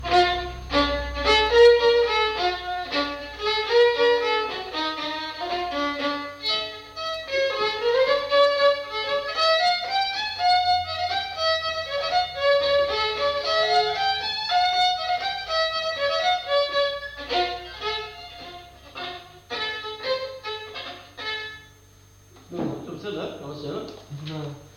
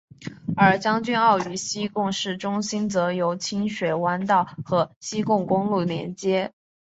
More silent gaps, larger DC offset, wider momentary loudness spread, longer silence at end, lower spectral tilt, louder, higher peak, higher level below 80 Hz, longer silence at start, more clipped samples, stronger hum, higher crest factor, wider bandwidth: second, none vs 4.96-5.01 s; neither; first, 15 LU vs 8 LU; second, 0.1 s vs 0.35 s; second, -3.5 dB/octave vs -5 dB/octave; about the same, -23 LUFS vs -23 LUFS; about the same, -6 dBFS vs -4 dBFS; first, -46 dBFS vs -62 dBFS; second, 0 s vs 0.2 s; neither; neither; about the same, 18 dB vs 18 dB; first, 15.5 kHz vs 8 kHz